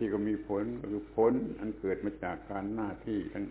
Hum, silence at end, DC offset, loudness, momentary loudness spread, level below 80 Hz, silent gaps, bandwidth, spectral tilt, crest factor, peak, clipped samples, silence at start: none; 0 s; under 0.1%; -34 LUFS; 9 LU; -56 dBFS; none; 4 kHz; -7.5 dB/octave; 18 dB; -16 dBFS; under 0.1%; 0 s